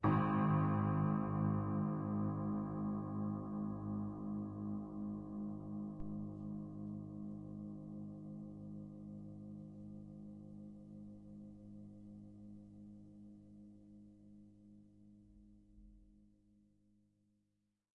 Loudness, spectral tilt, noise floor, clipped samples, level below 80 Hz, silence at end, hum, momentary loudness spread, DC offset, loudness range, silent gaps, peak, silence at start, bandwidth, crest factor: -42 LUFS; -11 dB/octave; -84 dBFS; under 0.1%; -66 dBFS; 1.7 s; none; 23 LU; under 0.1%; 22 LU; none; -24 dBFS; 0 s; 4.1 kHz; 20 dB